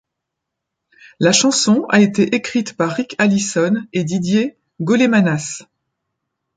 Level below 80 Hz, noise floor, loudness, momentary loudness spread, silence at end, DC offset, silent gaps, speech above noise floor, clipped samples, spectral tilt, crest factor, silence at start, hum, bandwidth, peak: -60 dBFS; -79 dBFS; -16 LUFS; 9 LU; 0.95 s; under 0.1%; none; 64 dB; under 0.1%; -4.5 dB/octave; 16 dB; 1.2 s; none; 9.6 kHz; 0 dBFS